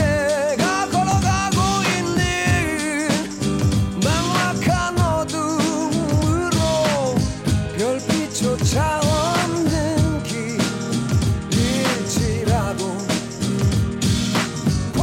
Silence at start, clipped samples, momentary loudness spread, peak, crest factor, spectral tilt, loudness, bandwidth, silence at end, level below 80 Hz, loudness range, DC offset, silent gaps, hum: 0 s; under 0.1%; 4 LU; -8 dBFS; 12 dB; -5 dB/octave; -20 LUFS; 16.5 kHz; 0 s; -34 dBFS; 1 LU; under 0.1%; none; none